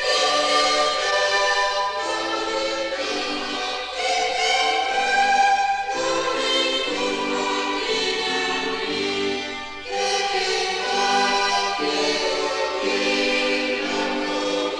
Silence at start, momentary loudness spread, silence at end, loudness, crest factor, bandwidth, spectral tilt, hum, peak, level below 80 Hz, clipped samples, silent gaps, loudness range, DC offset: 0 s; 6 LU; 0 s; -21 LUFS; 14 dB; 12 kHz; -1 dB/octave; none; -8 dBFS; -52 dBFS; under 0.1%; none; 3 LU; under 0.1%